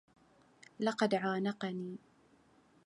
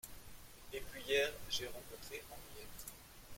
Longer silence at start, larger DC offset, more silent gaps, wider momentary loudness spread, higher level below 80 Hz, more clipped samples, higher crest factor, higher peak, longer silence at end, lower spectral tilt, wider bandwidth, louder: first, 0.8 s vs 0.05 s; neither; neither; second, 13 LU vs 21 LU; second, -82 dBFS vs -60 dBFS; neither; about the same, 20 dB vs 22 dB; first, -18 dBFS vs -22 dBFS; first, 0.9 s vs 0 s; first, -6 dB/octave vs -2 dB/octave; second, 11 kHz vs 16.5 kHz; first, -36 LUFS vs -42 LUFS